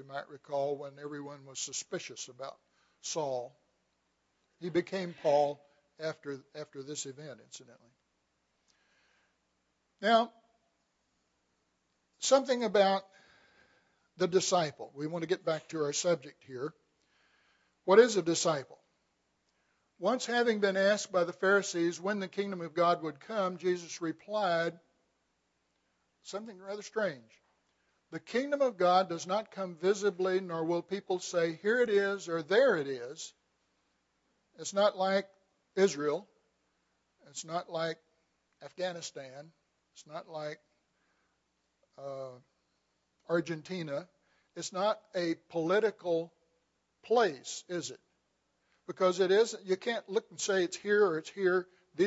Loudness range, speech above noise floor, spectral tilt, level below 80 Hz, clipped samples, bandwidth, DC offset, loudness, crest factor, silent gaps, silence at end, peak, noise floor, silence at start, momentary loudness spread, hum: 12 LU; 47 dB; -4 dB/octave; -86 dBFS; under 0.1%; 8 kHz; under 0.1%; -32 LUFS; 26 dB; none; 0 s; -8 dBFS; -79 dBFS; 0 s; 17 LU; none